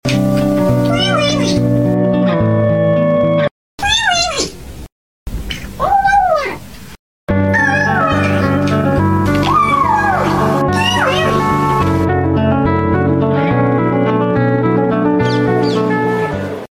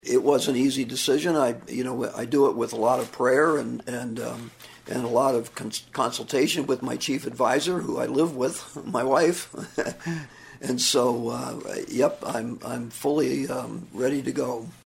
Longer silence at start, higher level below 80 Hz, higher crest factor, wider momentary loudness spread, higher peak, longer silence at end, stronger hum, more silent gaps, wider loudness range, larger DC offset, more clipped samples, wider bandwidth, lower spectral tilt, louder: about the same, 0.05 s vs 0.05 s; first, -34 dBFS vs -64 dBFS; second, 10 dB vs 20 dB; second, 8 LU vs 12 LU; about the same, -4 dBFS vs -6 dBFS; about the same, 0.05 s vs 0.1 s; neither; first, 3.51-3.78 s, 4.92-5.26 s, 6.99-7.27 s vs none; about the same, 3 LU vs 3 LU; neither; neither; about the same, 17 kHz vs 16 kHz; first, -5.5 dB/octave vs -4 dB/octave; first, -13 LUFS vs -25 LUFS